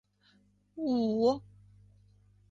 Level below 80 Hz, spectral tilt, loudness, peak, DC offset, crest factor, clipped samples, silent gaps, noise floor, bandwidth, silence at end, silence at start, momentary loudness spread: -66 dBFS; -7.5 dB/octave; -31 LUFS; -16 dBFS; under 0.1%; 18 dB; under 0.1%; none; -67 dBFS; 7.6 kHz; 1.1 s; 0.75 s; 12 LU